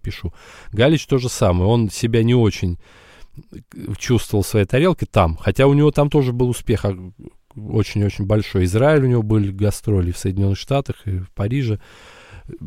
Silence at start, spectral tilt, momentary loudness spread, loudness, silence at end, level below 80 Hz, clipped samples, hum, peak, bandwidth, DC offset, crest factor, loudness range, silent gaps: 0.05 s; -6.5 dB/octave; 13 LU; -18 LUFS; 0 s; -36 dBFS; under 0.1%; none; -2 dBFS; 15.5 kHz; under 0.1%; 16 dB; 3 LU; none